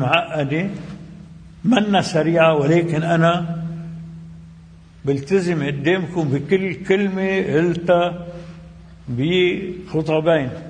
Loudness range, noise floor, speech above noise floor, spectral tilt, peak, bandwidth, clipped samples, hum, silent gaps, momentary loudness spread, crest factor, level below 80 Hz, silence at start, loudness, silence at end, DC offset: 3 LU; -43 dBFS; 25 dB; -6.5 dB/octave; -2 dBFS; 10 kHz; under 0.1%; none; none; 19 LU; 18 dB; -48 dBFS; 0 s; -19 LUFS; 0 s; under 0.1%